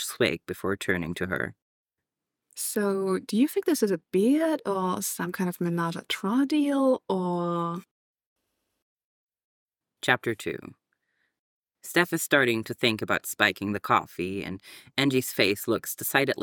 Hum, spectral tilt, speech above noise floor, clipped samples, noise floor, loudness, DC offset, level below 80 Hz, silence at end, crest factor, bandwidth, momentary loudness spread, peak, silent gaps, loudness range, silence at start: none; -4 dB/octave; 61 dB; under 0.1%; -87 dBFS; -27 LUFS; under 0.1%; -66 dBFS; 0 s; 24 dB; 19 kHz; 9 LU; -4 dBFS; 1.62-1.86 s, 7.91-8.14 s, 8.26-8.36 s, 8.82-8.97 s, 9.04-9.29 s, 9.44-9.68 s, 11.39-11.63 s; 8 LU; 0 s